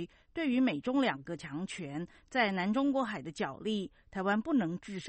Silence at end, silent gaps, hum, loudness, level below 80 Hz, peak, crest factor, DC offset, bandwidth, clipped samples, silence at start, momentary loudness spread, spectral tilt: 0 s; none; none; -33 LUFS; -66 dBFS; -14 dBFS; 18 dB; under 0.1%; 8.4 kHz; under 0.1%; 0 s; 11 LU; -6 dB/octave